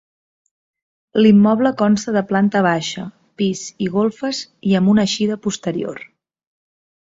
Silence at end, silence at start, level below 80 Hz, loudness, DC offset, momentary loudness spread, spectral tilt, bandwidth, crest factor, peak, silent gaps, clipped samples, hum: 1 s; 1.15 s; -58 dBFS; -17 LUFS; under 0.1%; 13 LU; -5.5 dB/octave; 7.8 kHz; 16 dB; -2 dBFS; none; under 0.1%; none